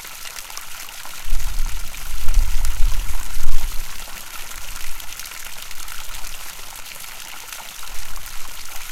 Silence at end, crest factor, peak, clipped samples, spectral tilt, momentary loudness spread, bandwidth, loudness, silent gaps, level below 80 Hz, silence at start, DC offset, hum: 0 s; 16 dB; 0 dBFS; 0.2%; -1.5 dB/octave; 7 LU; 16 kHz; -30 LUFS; none; -22 dBFS; 0 s; under 0.1%; none